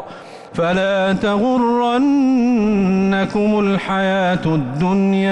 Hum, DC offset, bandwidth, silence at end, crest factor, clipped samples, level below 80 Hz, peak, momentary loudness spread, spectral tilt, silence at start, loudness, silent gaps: none; under 0.1%; 9 kHz; 0 s; 8 dB; under 0.1%; -46 dBFS; -8 dBFS; 4 LU; -7 dB/octave; 0 s; -16 LUFS; none